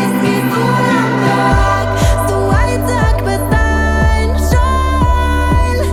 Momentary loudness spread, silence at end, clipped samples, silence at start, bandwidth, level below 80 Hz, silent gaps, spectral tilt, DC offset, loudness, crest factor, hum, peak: 2 LU; 0 s; under 0.1%; 0 s; 16 kHz; -16 dBFS; none; -6 dB/octave; under 0.1%; -13 LUFS; 10 dB; none; -2 dBFS